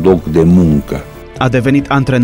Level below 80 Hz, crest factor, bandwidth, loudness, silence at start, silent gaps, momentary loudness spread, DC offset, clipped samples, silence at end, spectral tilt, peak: -30 dBFS; 10 dB; 16.5 kHz; -11 LUFS; 0 s; none; 14 LU; under 0.1%; under 0.1%; 0 s; -8 dB/octave; 0 dBFS